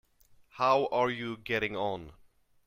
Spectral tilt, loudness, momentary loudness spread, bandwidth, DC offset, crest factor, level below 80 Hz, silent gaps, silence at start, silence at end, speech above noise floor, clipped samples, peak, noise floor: -5.5 dB/octave; -30 LUFS; 10 LU; 16 kHz; under 0.1%; 20 dB; -62 dBFS; none; 0.55 s; 0.55 s; 32 dB; under 0.1%; -12 dBFS; -62 dBFS